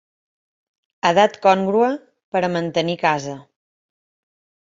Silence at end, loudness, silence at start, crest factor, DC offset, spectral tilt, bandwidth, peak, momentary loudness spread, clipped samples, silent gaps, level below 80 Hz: 1.3 s; -19 LUFS; 1.05 s; 20 dB; under 0.1%; -5 dB/octave; 7.8 kHz; -2 dBFS; 12 LU; under 0.1%; 2.24-2.32 s; -64 dBFS